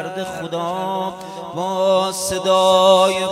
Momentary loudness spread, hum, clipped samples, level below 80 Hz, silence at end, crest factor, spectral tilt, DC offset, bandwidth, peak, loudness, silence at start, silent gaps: 14 LU; none; under 0.1%; -54 dBFS; 0 s; 16 dB; -3.5 dB/octave; under 0.1%; 15.5 kHz; -2 dBFS; -17 LUFS; 0 s; none